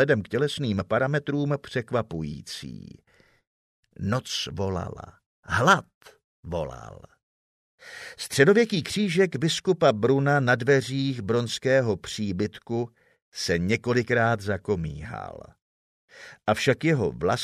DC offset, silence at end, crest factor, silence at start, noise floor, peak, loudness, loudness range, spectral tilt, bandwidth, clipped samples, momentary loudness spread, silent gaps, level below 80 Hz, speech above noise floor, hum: under 0.1%; 0 s; 22 dB; 0 s; under -90 dBFS; -4 dBFS; -25 LUFS; 9 LU; -5.5 dB/octave; 15 kHz; under 0.1%; 16 LU; 3.47-3.83 s, 5.26-5.43 s, 5.94-6.01 s, 6.24-6.43 s, 7.23-7.78 s, 13.22-13.32 s, 15.62-16.08 s; -54 dBFS; over 65 dB; none